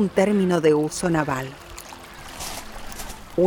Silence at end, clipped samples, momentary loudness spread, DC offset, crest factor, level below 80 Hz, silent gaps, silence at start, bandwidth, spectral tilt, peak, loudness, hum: 0 s; under 0.1%; 19 LU; under 0.1%; 18 dB; -44 dBFS; none; 0 s; over 20 kHz; -5.5 dB/octave; -6 dBFS; -22 LUFS; none